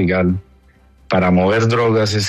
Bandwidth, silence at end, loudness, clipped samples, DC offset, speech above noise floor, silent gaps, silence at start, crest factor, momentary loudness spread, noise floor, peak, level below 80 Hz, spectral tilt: 13 kHz; 0 s; -16 LUFS; under 0.1%; under 0.1%; 35 dB; none; 0 s; 14 dB; 6 LU; -49 dBFS; -2 dBFS; -44 dBFS; -6 dB/octave